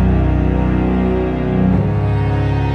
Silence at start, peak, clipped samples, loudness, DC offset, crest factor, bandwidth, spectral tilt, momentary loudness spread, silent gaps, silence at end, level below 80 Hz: 0 s; -4 dBFS; under 0.1%; -16 LUFS; under 0.1%; 10 dB; 5.6 kHz; -10 dB/octave; 2 LU; none; 0 s; -22 dBFS